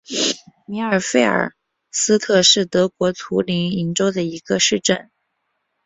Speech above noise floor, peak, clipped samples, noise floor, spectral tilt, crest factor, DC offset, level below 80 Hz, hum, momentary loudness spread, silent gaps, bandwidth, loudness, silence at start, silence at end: 54 dB; -2 dBFS; under 0.1%; -72 dBFS; -3 dB/octave; 18 dB; under 0.1%; -58 dBFS; none; 12 LU; none; 8.4 kHz; -18 LUFS; 0.1 s; 0.85 s